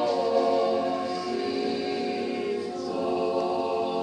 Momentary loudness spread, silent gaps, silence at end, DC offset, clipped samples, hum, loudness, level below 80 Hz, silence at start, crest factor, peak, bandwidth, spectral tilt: 6 LU; none; 0 s; under 0.1%; under 0.1%; none; -27 LUFS; -68 dBFS; 0 s; 16 dB; -10 dBFS; 10 kHz; -5 dB/octave